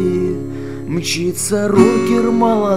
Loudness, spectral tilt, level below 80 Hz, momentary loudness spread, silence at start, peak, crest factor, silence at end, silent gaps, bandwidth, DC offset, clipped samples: -15 LUFS; -5 dB/octave; -48 dBFS; 12 LU; 0 s; 0 dBFS; 16 dB; 0 s; none; 16 kHz; 2%; under 0.1%